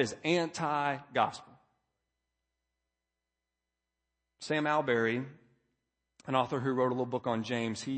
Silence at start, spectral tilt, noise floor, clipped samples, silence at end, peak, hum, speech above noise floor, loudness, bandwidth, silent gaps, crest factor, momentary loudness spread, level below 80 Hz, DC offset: 0 s; -5 dB/octave; -88 dBFS; under 0.1%; 0 s; -14 dBFS; none; 57 dB; -32 LUFS; 8.4 kHz; none; 22 dB; 7 LU; -76 dBFS; under 0.1%